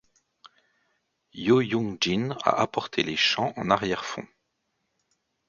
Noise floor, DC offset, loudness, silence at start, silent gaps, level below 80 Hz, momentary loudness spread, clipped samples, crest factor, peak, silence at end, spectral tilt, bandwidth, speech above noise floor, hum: -77 dBFS; under 0.1%; -25 LUFS; 1.35 s; none; -60 dBFS; 9 LU; under 0.1%; 24 dB; -4 dBFS; 1.25 s; -4.5 dB/octave; 7.4 kHz; 52 dB; none